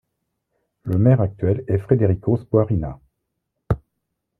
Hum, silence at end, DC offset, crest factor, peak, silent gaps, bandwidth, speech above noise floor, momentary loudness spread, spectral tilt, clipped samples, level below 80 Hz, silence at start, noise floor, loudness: none; 0.65 s; under 0.1%; 18 dB; -2 dBFS; none; 3.1 kHz; 59 dB; 10 LU; -12 dB/octave; under 0.1%; -42 dBFS; 0.85 s; -77 dBFS; -20 LUFS